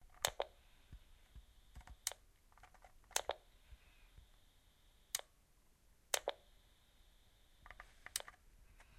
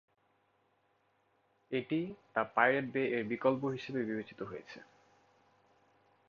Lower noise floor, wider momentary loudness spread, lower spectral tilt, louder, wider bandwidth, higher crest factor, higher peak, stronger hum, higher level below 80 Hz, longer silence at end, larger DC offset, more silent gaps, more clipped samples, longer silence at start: second, -71 dBFS vs -75 dBFS; first, 25 LU vs 16 LU; second, 0 dB/octave vs -4.5 dB/octave; second, -44 LUFS vs -35 LUFS; first, 15 kHz vs 7 kHz; first, 36 dB vs 24 dB; about the same, -14 dBFS vs -12 dBFS; neither; first, -66 dBFS vs -78 dBFS; second, 0.05 s vs 1.45 s; neither; neither; neither; second, 0 s vs 1.7 s